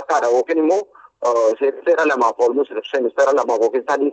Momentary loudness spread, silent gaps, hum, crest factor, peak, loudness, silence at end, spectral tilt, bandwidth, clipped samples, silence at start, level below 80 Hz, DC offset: 5 LU; none; none; 14 dB; -4 dBFS; -18 LUFS; 0 s; -3 dB/octave; 8.4 kHz; under 0.1%; 0 s; -78 dBFS; under 0.1%